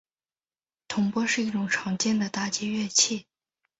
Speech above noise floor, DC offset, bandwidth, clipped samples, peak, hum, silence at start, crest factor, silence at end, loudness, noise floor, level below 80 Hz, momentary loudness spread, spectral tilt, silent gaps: over 64 dB; under 0.1%; 8 kHz; under 0.1%; -8 dBFS; none; 0.9 s; 22 dB; 0.6 s; -26 LUFS; under -90 dBFS; -68 dBFS; 7 LU; -2.5 dB/octave; none